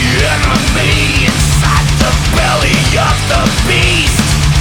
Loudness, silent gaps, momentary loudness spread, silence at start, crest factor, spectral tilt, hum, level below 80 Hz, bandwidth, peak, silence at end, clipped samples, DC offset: -10 LUFS; none; 2 LU; 0 s; 10 dB; -4 dB/octave; none; -16 dBFS; 19 kHz; 0 dBFS; 0 s; under 0.1%; under 0.1%